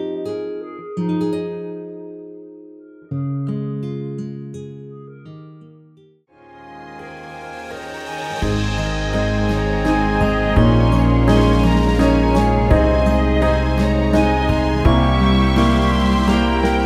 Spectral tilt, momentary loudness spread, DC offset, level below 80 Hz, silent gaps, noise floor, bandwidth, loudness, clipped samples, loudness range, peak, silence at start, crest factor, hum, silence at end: -7 dB/octave; 20 LU; under 0.1%; -24 dBFS; none; -51 dBFS; 11.5 kHz; -17 LUFS; under 0.1%; 18 LU; -2 dBFS; 0 s; 16 dB; none; 0 s